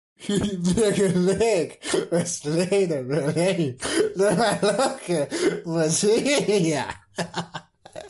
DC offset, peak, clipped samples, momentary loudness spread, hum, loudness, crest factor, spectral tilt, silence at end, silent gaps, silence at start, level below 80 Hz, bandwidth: under 0.1%; -10 dBFS; under 0.1%; 9 LU; none; -23 LUFS; 14 dB; -4.5 dB/octave; 0 s; none; 0.2 s; -52 dBFS; 12 kHz